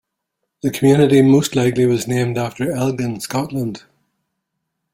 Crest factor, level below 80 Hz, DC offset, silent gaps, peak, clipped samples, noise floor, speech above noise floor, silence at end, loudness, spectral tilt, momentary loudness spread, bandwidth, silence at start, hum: 16 dB; -54 dBFS; under 0.1%; none; -2 dBFS; under 0.1%; -76 dBFS; 60 dB; 1.15 s; -17 LUFS; -6.5 dB/octave; 13 LU; 16.5 kHz; 0.65 s; none